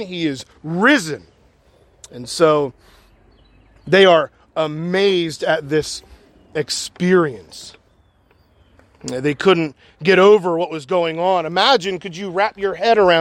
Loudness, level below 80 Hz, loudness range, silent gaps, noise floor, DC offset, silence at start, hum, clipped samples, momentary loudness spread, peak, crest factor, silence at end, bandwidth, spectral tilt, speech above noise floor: -17 LUFS; -56 dBFS; 6 LU; none; -56 dBFS; under 0.1%; 0 s; none; under 0.1%; 16 LU; 0 dBFS; 18 dB; 0 s; 13.5 kHz; -4.5 dB/octave; 39 dB